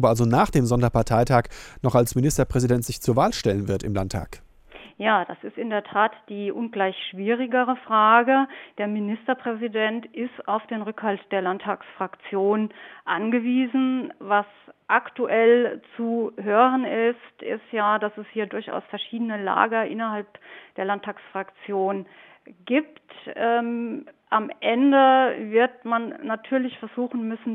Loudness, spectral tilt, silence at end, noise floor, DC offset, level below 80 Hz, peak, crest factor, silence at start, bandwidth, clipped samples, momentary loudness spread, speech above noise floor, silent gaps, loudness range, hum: -23 LUFS; -6 dB/octave; 0 s; -47 dBFS; under 0.1%; -46 dBFS; -2 dBFS; 22 dB; 0 s; 16 kHz; under 0.1%; 13 LU; 24 dB; none; 6 LU; none